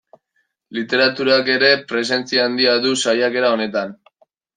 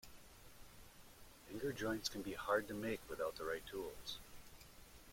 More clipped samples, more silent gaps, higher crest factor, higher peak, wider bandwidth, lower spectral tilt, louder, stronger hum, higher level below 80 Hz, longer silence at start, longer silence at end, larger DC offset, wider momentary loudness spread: neither; neither; about the same, 18 dB vs 22 dB; first, -2 dBFS vs -24 dBFS; second, 9.8 kHz vs 16.5 kHz; about the same, -3 dB/octave vs -4 dB/octave; first, -17 LUFS vs -44 LUFS; neither; about the same, -68 dBFS vs -64 dBFS; first, 0.7 s vs 0.05 s; first, 0.65 s vs 0 s; neither; second, 10 LU vs 22 LU